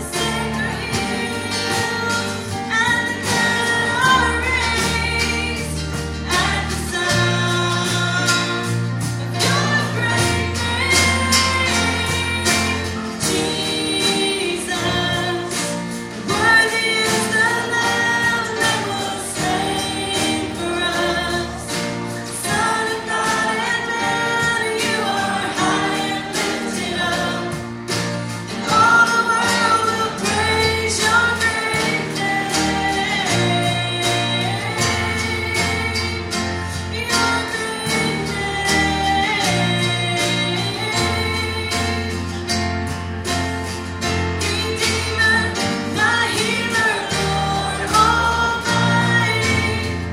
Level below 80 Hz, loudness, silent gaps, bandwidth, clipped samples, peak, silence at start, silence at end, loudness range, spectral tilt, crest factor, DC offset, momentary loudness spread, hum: -38 dBFS; -18 LUFS; none; 16.5 kHz; under 0.1%; 0 dBFS; 0 s; 0 s; 4 LU; -3.5 dB/octave; 18 dB; under 0.1%; 8 LU; none